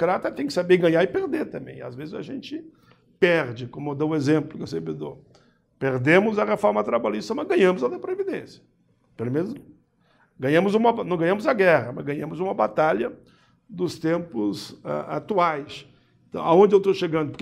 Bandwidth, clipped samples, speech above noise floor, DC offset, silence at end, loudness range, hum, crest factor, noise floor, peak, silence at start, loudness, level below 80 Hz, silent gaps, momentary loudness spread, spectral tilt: 13 kHz; under 0.1%; 40 dB; under 0.1%; 0.05 s; 4 LU; none; 20 dB; -62 dBFS; -4 dBFS; 0 s; -23 LUFS; -64 dBFS; none; 16 LU; -6.5 dB/octave